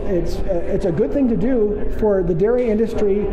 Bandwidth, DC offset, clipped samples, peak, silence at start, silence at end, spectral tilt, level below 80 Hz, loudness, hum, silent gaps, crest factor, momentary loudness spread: 8.6 kHz; under 0.1%; under 0.1%; -8 dBFS; 0 s; 0 s; -8.5 dB/octave; -28 dBFS; -19 LUFS; none; none; 10 dB; 5 LU